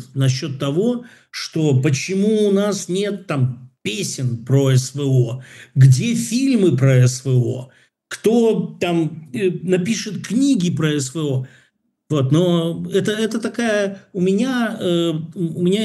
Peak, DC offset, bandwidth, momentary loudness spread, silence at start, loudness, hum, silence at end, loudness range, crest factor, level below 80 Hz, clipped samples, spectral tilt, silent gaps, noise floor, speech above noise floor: 0 dBFS; under 0.1%; 12.5 kHz; 9 LU; 0 s; -19 LUFS; none; 0 s; 4 LU; 18 dB; -64 dBFS; under 0.1%; -6 dB/octave; none; -61 dBFS; 43 dB